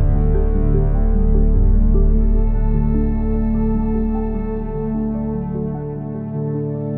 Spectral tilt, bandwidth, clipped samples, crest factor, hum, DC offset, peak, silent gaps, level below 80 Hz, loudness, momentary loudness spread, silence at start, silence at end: -12.5 dB/octave; 2.3 kHz; under 0.1%; 12 dB; none; under 0.1%; -4 dBFS; none; -18 dBFS; -20 LUFS; 7 LU; 0 s; 0 s